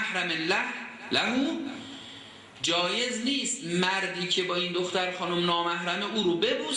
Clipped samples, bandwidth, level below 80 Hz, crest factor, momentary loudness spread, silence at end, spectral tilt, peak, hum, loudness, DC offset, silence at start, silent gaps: under 0.1%; 11.5 kHz; -68 dBFS; 18 dB; 12 LU; 0 s; -3 dB/octave; -12 dBFS; none; -27 LUFS; under 0.1%; 0 s; none